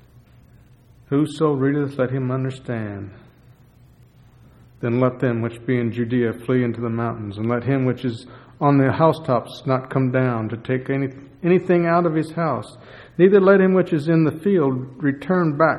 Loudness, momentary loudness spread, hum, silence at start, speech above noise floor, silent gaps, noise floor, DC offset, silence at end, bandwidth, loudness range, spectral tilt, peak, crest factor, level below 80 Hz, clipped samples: -20 LUFS; 11 LU; none; 1.1 s; 31 dB; none; -50 dBFS; under 0.1%; 0 s; 11.5 kHz; 8 LU; -9 dB/octave; -2 dBFS; 18 dB; -56 dBFS; under 0.1%